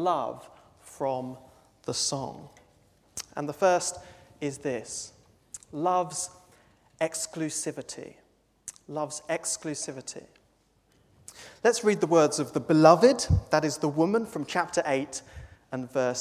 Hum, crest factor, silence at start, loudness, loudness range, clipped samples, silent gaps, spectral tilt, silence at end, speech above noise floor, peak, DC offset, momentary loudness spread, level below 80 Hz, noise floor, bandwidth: none; 26 dB; 0 s; -27 LUFS; 11 LU; under 0.1%; none; -4.5 dB/octave; 0 s; 40 dB; -4 dBFS; under 0.1%; 21 LU; -48 dBFS; -66 dBFS; 16 kHz